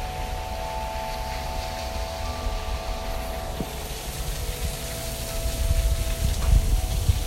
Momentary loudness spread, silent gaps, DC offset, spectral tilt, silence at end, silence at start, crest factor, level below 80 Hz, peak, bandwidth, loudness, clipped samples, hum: 7 LU; none; under 0.1%; -4.5 dB/octave; 0 s; 0 s; 18 dB; -28 dBFS; -8 dBFS; 16 kHz; -29 LUFS; under 0.1%; none